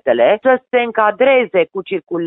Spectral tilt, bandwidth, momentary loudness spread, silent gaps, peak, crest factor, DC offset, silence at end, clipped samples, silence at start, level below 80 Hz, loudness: -9.5 dB/octave; 4 kHz; 8 LU; none; -2 dBFS; 14 dB; under 0.1%; 0 s; under 0.1%; 0.05 s; -64 dBFS; -14 LUFS